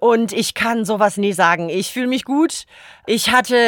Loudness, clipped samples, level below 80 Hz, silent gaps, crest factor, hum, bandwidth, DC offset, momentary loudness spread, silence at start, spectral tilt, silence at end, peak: -17 LUFS; under 0.1%; -56 dBFS; none; 16 dB; none; 20 kHz; under 0.1%; 7 LU; 0 s; -3.5 dB/octave; 0 s; 0 dBFS